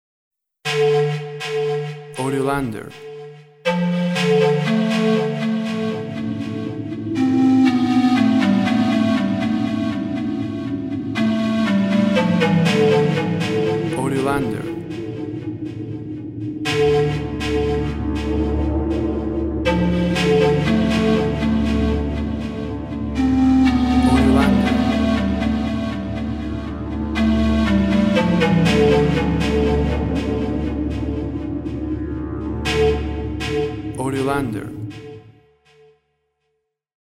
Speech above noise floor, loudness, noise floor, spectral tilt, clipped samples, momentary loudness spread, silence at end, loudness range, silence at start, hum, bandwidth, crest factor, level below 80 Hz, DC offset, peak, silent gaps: 54 dB; -19 LUFS; -73 dBFS; -7 dB/octave; under 0.1%; 12 LU; 1.8 s; 6 LU; 0.65 s; none; 13 kHz; 16 dB; -32 dBFS; under 0.1%; -2 dBFS; none